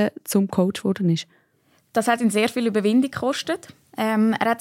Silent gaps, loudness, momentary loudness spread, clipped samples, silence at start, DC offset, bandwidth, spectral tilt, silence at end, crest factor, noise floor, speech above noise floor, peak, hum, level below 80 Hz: none; -22 LUFS; 7 LU; under 0.1%; 0 s; under 0.1%; 16.5 kHz; -5.5 dB/octave; 0 s; 16 dB; -63 dBFS; 42 dB; -6 dBFS; none; -66 dBFS